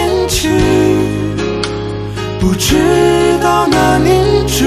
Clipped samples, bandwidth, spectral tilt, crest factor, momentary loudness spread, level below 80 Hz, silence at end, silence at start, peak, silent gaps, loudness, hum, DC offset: under 0.1%; 14.5 kHz; -5 dB/octave; 12 dB; 8 LU; -26 dBFS; 0 s; 0 s; 0 dBFS; none; -12 LUFS; none; under 0.1%